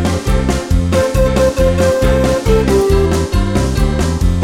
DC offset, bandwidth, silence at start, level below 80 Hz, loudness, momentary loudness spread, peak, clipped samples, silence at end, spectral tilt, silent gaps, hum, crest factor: under 0.1%; 16 kHz; 0 s; -18 dBFS; -14 LUFS; 3 LU; -2 dBFS; under 0.1%; 0 s; -6 dB/octave; none; none; 12 dB